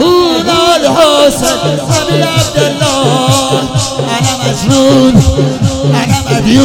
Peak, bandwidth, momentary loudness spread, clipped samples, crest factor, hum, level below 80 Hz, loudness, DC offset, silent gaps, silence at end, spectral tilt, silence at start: 0 dBFS; 18 kHz; 6 LU; 2%; 8 dB; none; -28 dBFS; -9 LUFS; under 0.1%; none; 0 s; -5 dB/octave; 0 s